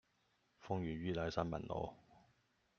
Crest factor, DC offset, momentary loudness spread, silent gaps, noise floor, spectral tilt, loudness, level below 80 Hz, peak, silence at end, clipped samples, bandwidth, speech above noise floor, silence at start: 24 dB; under 0.1%; 7 LU; none; -79 dBFS; -6 dB/octave; -43 LUFS; -64 dBFS; -20 dBFS; 0.6 s; under 0.1%; 7 kHz; 38 dB; 0.6 s